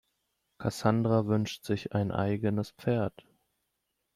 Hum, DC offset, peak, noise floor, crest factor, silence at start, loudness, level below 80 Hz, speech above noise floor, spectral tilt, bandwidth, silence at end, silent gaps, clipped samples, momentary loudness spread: none; under 0.1%; -12 dBFS; -81 dBFS; 20 dB; 0.6 s; -30 LUFS; -62 dBFS; 52 dB; -7 dB/octave; 14.5 kHz; 1.05 s; none; under 0.1%; 8 LU